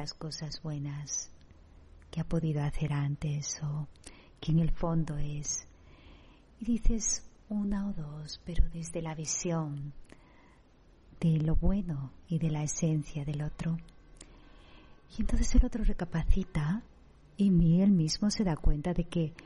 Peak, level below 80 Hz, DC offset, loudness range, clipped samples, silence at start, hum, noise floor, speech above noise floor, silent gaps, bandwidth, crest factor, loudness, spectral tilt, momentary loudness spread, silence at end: -10 dBFS; -36 dBFS; under 0.1%; 6 LU; under 0.1%; 0 s; none; -60 dBFS; 30 dB; none; 11 kHz; 20 dB; -32 LUFS; -5.5 dB/octave; 11 LU; 0.05 s